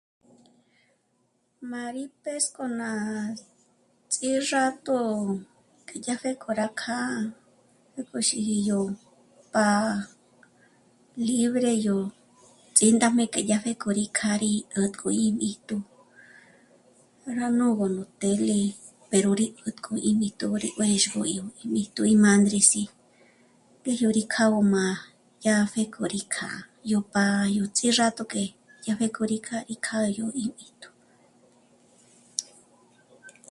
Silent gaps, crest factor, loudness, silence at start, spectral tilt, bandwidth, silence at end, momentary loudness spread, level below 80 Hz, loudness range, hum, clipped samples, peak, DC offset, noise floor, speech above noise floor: none; 24 dB; -26 LUFS; 1.6 s; -4 dB/octave; 11.5 kHz; 0.2 s; 14 LU; -68 dBFS; 9 LU; none; under 0.1%; -2 dBFS; under 0.1%; -70 dBFS; 45 dB